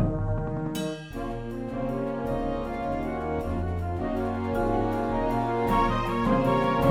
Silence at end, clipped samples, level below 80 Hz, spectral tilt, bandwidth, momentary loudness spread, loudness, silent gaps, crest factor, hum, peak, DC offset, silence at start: 0 s; under 0.1%; -38 dBFS; -7.5 dB/octave; 17 kHz; 9 LU; -28 LUFS; none; 20 dB; none; -8 dBFS; under 0.1%; 0 s